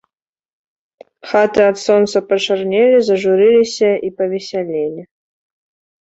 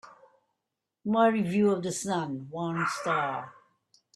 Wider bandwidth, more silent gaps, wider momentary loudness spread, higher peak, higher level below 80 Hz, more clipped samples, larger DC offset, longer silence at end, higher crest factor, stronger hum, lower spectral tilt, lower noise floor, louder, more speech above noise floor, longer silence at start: second, 8 kHz vs 13 kHz; neither; about the same, 10 LU vs 12 LU; first, 0 dBFS vs -10 dBFS; first, -60 dBFS vs -70 dBFS; neither; neither; first, 1 s vs 0.65 s; about the same, 14 dB vs 18 dB; neither; about the same, -4.5 dB/octave vs -5.5 dB/octave; second, -70 dBFS vs -86 dBFS; first, -14 LUFS vs -28 LUFS; about the same, 56 dB vs 58 dB; first, 1.25 s vs 0.05 s